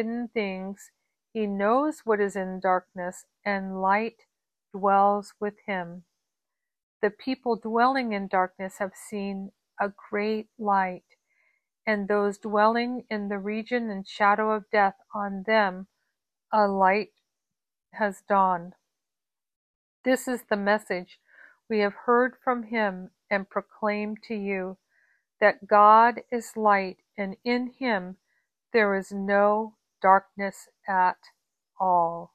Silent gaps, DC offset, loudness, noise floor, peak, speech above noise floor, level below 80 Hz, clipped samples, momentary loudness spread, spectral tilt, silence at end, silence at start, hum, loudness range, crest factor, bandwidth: 6.83-7.00 s, 19.56-20.04 s; under 0.1%; -26 LUFS; under -90 dBFS; -6 dBFS; over 65 dB; -70 dBFS; under 0.1%; 13 LU; -5.5 dB/octave; 0.1 s; 0 s; none; 6 LU; 22 dB; 14.5 kHz